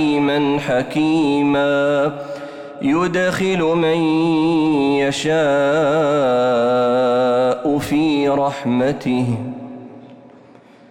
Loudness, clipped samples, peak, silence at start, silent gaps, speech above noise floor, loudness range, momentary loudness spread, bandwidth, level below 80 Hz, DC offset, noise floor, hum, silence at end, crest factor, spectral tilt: -17 LUFS; under 0.1%; -8 dBFS; 0 s; none; 29 dB; 3 LU; 7 LU; 14 kHz; -52 dBFS; under 0.1%; -45 dBFS; none; 0.75 s; 8 dB; -6 dB/octave